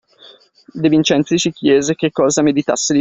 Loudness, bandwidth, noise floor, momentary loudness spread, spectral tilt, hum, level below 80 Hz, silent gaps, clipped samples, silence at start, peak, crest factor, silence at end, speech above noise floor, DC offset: -15 LUFS; 8.4 kHz; -45 dBFS; 4 LU; -4.5 dB/octave; none; -54 dBFS; none; under 0.1%; 0.75 s; -2 dBFS; 14 dB; 0 s; 31 dB; under 0.1%